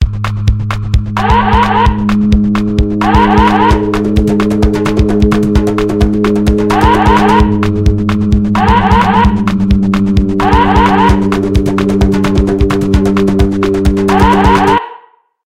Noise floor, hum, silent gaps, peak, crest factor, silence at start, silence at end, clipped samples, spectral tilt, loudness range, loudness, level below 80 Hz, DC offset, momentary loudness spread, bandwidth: -41 dBFS; none; none; 0 dBFS; 10 dB; 0 s; 0.4 s; 0.3%; -7 dB/octave; 1 LU; -10 LUFS; -16 dBFS; 2%; 5 LU; 13 kHz